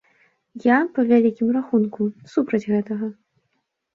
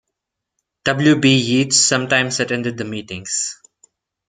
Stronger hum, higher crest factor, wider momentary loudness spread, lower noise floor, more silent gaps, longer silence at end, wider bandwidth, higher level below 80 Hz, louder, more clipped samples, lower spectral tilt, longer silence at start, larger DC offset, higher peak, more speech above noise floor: neither; about the same, 18 dB vs 18 dB; second, 10 LU vs 13 LU; second, -73 dBFS vs -80 dBFS; neither; about the same, 0.85 s vs 0.75 s; second, 7 kHz vs 9.6 kHz; second, -68 dBFS vs -58 dBFS; second, -21 LUFS vs -17 LUFS; neither; first, -8.5 dB/octave vs -3.5 dB/octave; second, 0.55 s vs 0.85 s; neither; second, -4 dBFS vs 0 dBFS; second, 53 dB vs 63 dB